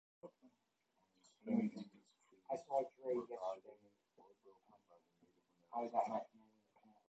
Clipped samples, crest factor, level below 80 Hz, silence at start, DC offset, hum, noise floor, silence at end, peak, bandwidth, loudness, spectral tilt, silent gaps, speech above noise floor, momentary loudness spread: under 0.1%; 24 dB; under -90 dBFS; 0.25 s; under 0.1%; none; -83 dBFS; 0.85 s; -24 dBFS; 8.2 kHz; -44 LUFS; -7.5 dB/octave; none; 41 dB; 20 LU